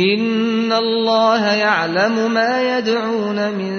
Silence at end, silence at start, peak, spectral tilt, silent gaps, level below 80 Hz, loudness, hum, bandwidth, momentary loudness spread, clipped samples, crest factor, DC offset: 0 s; 0 s; -2 dBFS; -5 dB/octave; none; -64 dBFS; -16 LUFS; none; 6.6 kHz; 5 LU; under 0.1%; 14 dB; under 0.1%